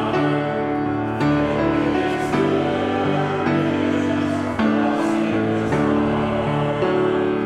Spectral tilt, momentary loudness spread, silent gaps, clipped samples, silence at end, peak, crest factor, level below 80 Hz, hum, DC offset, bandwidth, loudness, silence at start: -7 dB/octave; 2 LU; none; under 0.1%; 0 s; -8 dBFS; 12 dB; -46 dBFS; none; under 0.1%; 11 kHz; -20 LUFS; 0 s